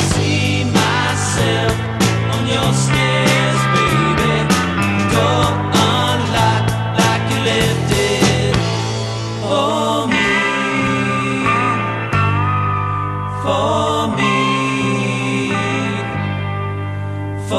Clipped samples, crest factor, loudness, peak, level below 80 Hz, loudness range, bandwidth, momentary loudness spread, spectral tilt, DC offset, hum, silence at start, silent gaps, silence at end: under 0.1%; 14 dB; -16 LUFS; 0 dBFS; -36 dBFS; 3 LU; 13 kHz; 7 LU; -5 dB/octave; under 0.1%; none; 0 s; none; 0 s